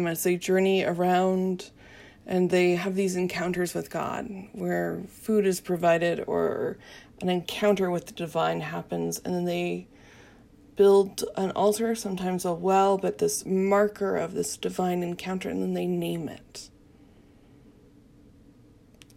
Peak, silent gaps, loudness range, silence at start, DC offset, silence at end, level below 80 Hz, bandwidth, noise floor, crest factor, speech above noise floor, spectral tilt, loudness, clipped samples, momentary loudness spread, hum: -10 dBFS; none; 7 LU; 0 s; under 0.1%; 2.5 s; -62 dBFS; 16 kHz; -55 dBFS; 18 dB; 29 dB; -5.5 dB/octave; -26 LUFS; under 0.1%; 11 LU; none